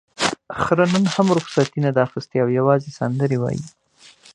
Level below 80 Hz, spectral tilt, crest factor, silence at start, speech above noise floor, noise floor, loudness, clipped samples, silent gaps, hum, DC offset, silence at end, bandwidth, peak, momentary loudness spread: -54 dBFS; -6 dB/octave; 18 dB; 0.2 s; 30 dB; -49 dBFS; -20 LUFS; under 0.1%; none; none; under 0.1%; 0.65 s; 11.5 kHz; -2 dBFS; 8 LU